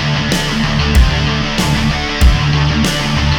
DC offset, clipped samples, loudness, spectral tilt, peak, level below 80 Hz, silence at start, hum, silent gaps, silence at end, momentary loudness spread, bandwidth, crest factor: under 0.1%; under 0.1%; -13 LUFS; -5 dB/octave; 0 dBFS; -16 dBFS; 0 s; none; none; 0 s; 3 LU; 18.5 kHz; 12 dB